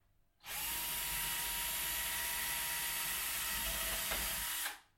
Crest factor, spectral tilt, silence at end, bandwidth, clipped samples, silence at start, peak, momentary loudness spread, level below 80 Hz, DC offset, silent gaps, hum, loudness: 14 dB; 0.5 dB/octave; 0.15 s; 16.5 kHz; under 0.1%; 0.45 s; -24 dBFS; 3 LU; -56 dBFS; under 0.1%; none; none; -36 LUFS